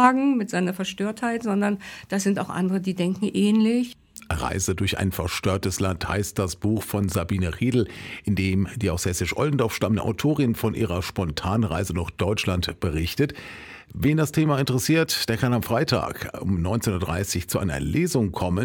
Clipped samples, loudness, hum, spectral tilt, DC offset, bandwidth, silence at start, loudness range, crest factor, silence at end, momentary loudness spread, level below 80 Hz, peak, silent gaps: under 0.1%; -24 LUFS; none; -5.5 dB/octave; under 0.1%; 19 kHz; 0 s; 2 LU; 18 dB; 0 s; 6 LU; -42 dBFS; -6 dBFS; none